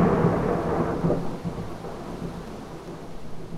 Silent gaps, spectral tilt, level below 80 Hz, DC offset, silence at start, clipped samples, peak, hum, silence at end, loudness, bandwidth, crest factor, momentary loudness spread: none; -8 dB/octave; -42 dBFS; under 0.1%; 0 s; under 0.1%; -8 dBFS; none; 0 s; -27 LUFS; 13 kHz; 18 dB; 16 LU